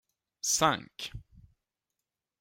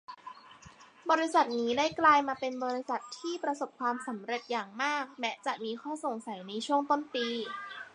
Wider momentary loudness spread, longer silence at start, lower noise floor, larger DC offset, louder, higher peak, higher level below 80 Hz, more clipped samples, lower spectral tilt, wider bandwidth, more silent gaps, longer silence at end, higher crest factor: first, 16 LU vs 13 LU; first, 0.45 s vs 0.1 s; first, -88 dBFS vs -55 dBFS; neither; first, -28 LUFS vs -31 LUFS; about the same, -12 dBFS vs -12 dBFS; first, -58 dBFS vs -74 dBFS; neither; about the same, -2 dB/octave vs -3 dB/octave; first, 16 kHz vs 11 kHz; neither; first, 1.2 s vs 0.05 s; about the same, 24 dB vs 20 dB